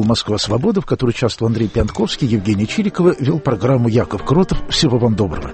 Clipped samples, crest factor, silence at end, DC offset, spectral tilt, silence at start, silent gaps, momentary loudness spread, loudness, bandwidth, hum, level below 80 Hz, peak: under 0.1%; 14 dB; 0 s; under 0.1%; -6 dB/octave; 0 s; none; 4 LU; -16 LUFS; 8.8 kHz; none; -32 dBFS; -2 dBFS